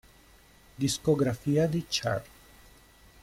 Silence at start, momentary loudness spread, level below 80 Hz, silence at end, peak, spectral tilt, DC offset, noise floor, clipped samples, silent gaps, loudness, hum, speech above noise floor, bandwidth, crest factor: 0.8 s; 6 LU; -56 dBFS; 1 s; -12 dBFS; -5 dB/octave; under 0.1%; -57 dBFS; under 0.1%; none; -28 LUFS; none; 30 dB; 16.5 kHz; 18 dB